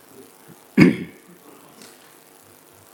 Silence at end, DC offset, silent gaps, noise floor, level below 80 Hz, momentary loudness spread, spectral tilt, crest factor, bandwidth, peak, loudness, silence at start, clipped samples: 1.9 s; under 0.1%; none; -50 dBFS; -54 dBFS; 28 LU; -7 dB/octave; 24 dB; 19 kHz; 0 dBFS; -18 LUFS; 0.75 s; under 0.1%